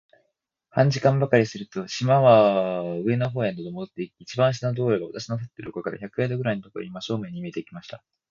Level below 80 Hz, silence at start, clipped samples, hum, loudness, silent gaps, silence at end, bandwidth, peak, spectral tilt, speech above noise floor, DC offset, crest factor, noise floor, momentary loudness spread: -62 dBFS; 0.75 s; under 0.1%; none; -24 LUFS; none; 0.35 s; 7.4 kHz; -4 dBFS; -7 dB/octave; 53 dB; under 0.1%; 20 dB; -76 dBFS; 16 LU